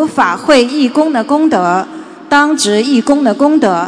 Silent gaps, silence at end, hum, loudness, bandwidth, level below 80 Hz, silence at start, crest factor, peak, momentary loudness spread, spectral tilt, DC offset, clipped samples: none; 0 s; none; -11 LUFS; 11 kHz; -52 dBFS; 0 s; 10 dB; 0 dBFS; 4 LU; -4 dB/octave; under 0.1%; 0.7%